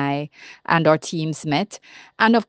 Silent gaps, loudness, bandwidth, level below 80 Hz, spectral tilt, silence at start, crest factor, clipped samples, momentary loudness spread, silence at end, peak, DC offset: none; -21 LUFS; 9.6 kHz; -64 dBFS; -5.5 dB/octave; 0 s; 20 dB; under 0.1%; 18 LU; 0.05 s; -2 dBFS; under 0.1%